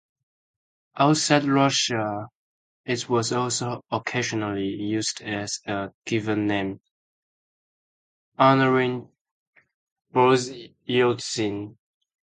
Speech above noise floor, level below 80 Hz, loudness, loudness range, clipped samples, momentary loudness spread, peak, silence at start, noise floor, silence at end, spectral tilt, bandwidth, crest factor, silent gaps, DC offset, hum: over 67 dB; -62 dBFS; -23 LUFS; 5 LU; under 0.1%; 15 LU; -2 dBFS; 0.95 s; under -90 dBFS; 0.6 s; -4.5 dB/octave; 9.6 kHz; 22 dB; 2.35-2.84 s, 5.94-6.02 s, 6.91-8.32 s, 9.21-9.25 s, 9.31-9.53 s, 9.74-9.96 s; under 0.1%; none